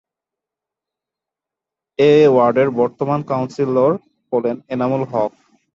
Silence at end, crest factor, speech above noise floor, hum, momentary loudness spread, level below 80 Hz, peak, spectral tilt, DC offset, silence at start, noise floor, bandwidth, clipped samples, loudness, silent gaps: 0.45 s; 16 dB; 70 dB; none; 11 LU; -62 dBFS; -2 dBFS; -8 dB/octave; under 0.1%; 2 s; -86 dBFS; 7.4 kHz; under 0.1%; -17 LUFS; none